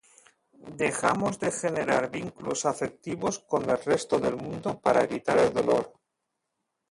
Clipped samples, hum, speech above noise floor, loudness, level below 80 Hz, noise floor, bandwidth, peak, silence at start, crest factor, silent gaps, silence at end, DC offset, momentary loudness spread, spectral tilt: under 0.1%; none; 55 dB; -27 LUFS; -62 dBFS; -82 dBFS; 11.5 kHz; -8 dBFS; 0.65 s; 20 dB; none; 1 s; under 0.1%; 9 LU; -4.5 dB/octave